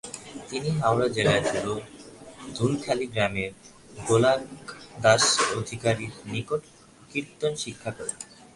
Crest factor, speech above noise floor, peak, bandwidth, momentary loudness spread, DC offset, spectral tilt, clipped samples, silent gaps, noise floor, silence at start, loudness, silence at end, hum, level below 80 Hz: 20 dB; 19 dB; -6 dBFS; 11.5 kHz; 19 LU; under 0.1%; -4 dB/octave; under 0.1%; none; -45 dBFS; 0.05 s; -26 LUFS; 0.1 s; none; -56 dBFS